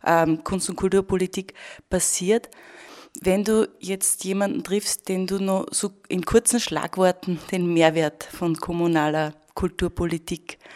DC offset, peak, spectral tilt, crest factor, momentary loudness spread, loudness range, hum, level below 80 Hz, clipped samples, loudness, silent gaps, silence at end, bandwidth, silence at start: under 0.1%; -2 dBFS; -4 dB/octave; 22 dB; 10 LU; 2 LU; none; -46 dBFS; under 0.1%; -23 LUFS; none; 0 s; 16 kHz; 0.05 s